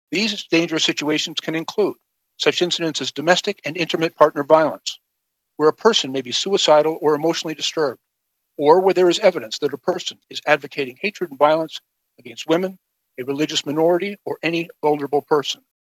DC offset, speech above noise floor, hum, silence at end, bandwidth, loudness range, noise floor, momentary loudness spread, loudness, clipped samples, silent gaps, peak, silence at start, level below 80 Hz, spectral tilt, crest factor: under 0.1%; 57 dB; none; 0.3 s; 14.5 kHz; 5 LU; -76 dBFS; 12 LU; -19 LUFS; under 0.1%; none; 0 dBFS; 0.1 s; -76 dBFS; -3.5 dB/octave; 20 dB